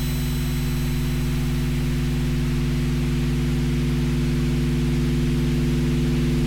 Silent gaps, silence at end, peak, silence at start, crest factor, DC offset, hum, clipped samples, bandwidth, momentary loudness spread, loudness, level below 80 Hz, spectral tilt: none; 0 s; -14 dBFS; 0 s; 6 dB; 1%; none; under 0.1%; 17 kHz; 3 LU; -23 LUFS; -26 dBFS; -6.5 dB/octave